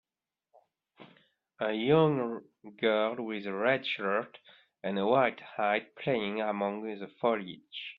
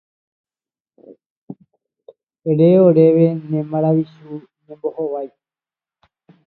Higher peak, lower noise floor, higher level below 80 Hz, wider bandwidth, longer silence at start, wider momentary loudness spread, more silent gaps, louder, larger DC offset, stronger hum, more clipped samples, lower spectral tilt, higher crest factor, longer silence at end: second, -12 dBFS vs 0 dBFS; about the same, under -90 dBFS vs under -90 dBFS; about the same, -74 dBFS vs -70 dBFS; first, 5.4 kHz vs 4.4 kHz; second, 1 s vs 1.5 s; second, 12 LU vs 23 LU; neither; second, -31 LUFS vs -16 LUFS; neither; neither; neither; second, -8.5 dB/octave vs -13 dB/octave; about the same, 20 dB vs 18 dB; second, 0.05 s vs 1.2 s